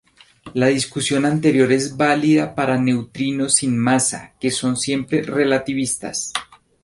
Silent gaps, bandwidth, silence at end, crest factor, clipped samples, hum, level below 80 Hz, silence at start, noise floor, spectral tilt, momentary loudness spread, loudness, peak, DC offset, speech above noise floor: none; 11.5 kHz; 0.4 s; 18 dB; under 0.1%; none; -56 dBFS; 0.45 s; -43 dBFS; -4 dB/octave; 8 LU; -19 LUFS; -2 dBFS; under 0.1%; 25 dB